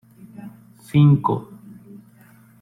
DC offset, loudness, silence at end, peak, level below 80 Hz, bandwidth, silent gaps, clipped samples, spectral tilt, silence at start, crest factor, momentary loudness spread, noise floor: under 0.1%; -18 LUFS; 1.2 s; -6 dBFS; -56 dBFS; 11 kHz; none; under 0.1%; -9 dB/octave; 0.4 s; 16 dB; 26 LU; -50 dBFS